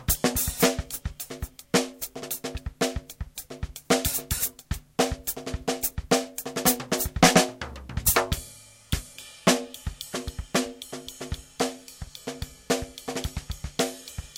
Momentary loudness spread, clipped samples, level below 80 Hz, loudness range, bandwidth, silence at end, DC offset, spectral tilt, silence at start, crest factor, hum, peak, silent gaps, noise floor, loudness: 16 LU; under 0.1%; -40 dBFS; 8 LU; 17 kHz; 0 s; under 0.1%; -3.5 dB/octave; 0 s; 26 dB; none; -2 dBFS; none; -48 dBFS; -27 LUFS